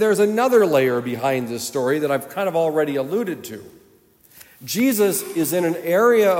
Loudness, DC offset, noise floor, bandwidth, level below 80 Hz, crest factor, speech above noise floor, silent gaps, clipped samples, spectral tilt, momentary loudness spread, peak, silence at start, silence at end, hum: -20 LUFS; under 0.1%; -54 dBFS; 16.5 kHz; -70 dBFS; 16 dB; 35 dB; none; under 0.1%; -4.5 dB/octave; 11 LU; -4 dBFS; 0 s; 0 s; none